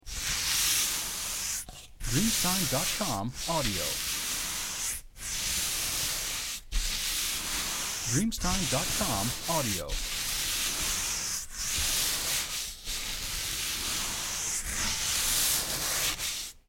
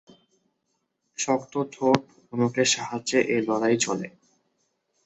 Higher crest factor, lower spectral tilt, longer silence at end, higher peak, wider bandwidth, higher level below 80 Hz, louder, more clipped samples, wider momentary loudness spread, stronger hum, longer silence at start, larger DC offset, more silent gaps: second, 18 dB vs 26 dB; second, -1.5 dB/octave vs -3.5 dB/octave; second, 0.1 s vs 0.95 s; second, -12 dBFS vs -2 dBFS; first, 17 kHz vs 8.4 kHz; first, -42 dBFS vs -68 dBFS; second, -29 LUFS vs -25 LUFS; neither; about the same, 7 LU vs 9 LU; neither; second, 0.05 s vs 1.2 s; neither; neither